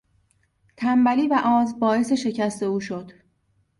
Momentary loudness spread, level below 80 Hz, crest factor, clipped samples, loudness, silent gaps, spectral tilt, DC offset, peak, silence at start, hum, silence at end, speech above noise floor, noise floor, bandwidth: 9 LU; -64 dBFS; 16 dB; under 0.1%; -22 LUFS; none; -5.5 dB/octave; under 0.1%; -8 dBFS; 0.8 s; none; 0.7 s; 46 dB; -67 dBFS; 11.5 kHz